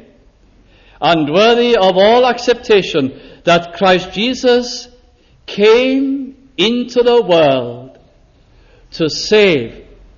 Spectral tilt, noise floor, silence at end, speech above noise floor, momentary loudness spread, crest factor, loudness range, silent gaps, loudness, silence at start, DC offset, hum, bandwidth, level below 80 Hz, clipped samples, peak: -4.5 dB/octave; -48 dBFS; 0.35 s; 36 dB; 14 LU; 14 dB; 3 LU; none; -12 LUFS; 1 s; under 0.1%; none; 7.4 kHz; -46 dBFS; under 0.1%; 0 dBFS